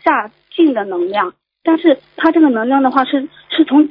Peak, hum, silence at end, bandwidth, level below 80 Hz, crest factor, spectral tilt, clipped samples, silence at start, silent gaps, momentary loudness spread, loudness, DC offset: 0 dBFS; none; 0 s; 5.4 kHz; -62 dBFS; 14 dB; -7.5 dB/octave; under 0.1%; 0.05 s; none; 9 LU; -14 LUFS; under 0.1%